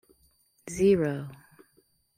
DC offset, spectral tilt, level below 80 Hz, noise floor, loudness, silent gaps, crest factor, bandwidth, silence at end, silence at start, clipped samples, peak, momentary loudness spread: under 0.1%; -6.5 dB/octave; -58 dBFS; -67 dBFS; -26 LUFS; none; 18 dB; 15 kHz; 0.8 s; 0.65 s; under 0.1%; -12 dBFS; 22 LU